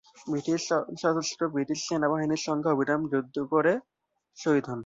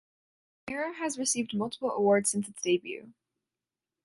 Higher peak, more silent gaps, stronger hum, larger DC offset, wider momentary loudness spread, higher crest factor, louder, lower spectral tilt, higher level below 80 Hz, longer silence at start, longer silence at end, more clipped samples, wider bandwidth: about the same, -12 dBFS vs -12 dBFS; neither; neither; neither; second, 5 LU vs 15 LU; about the same, 16 dB vs 18 dB; about the same, -28 LUFS vs -29 LUFS; first, -5 dB/octave vs -3.5 dB/octave; about the same, -70 dBFS vs -74 dBFS; second, 0.2 s vs 0.65 s; second, 0 s vs 0.95 s; neither; second, 7.8 kHz vs 11.5 kHz